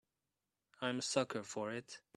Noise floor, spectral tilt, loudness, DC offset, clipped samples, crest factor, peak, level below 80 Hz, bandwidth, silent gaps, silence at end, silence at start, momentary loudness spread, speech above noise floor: under -90 dBFS; -3.5 dB/octave; -40 LUFS; under 0.1%; under 0.1%; 24 dB; -20 dBFS; -84 dBFS; 12.5 kHz; none; 0.2 s; 0.8 s; 7 LU; over 49 dB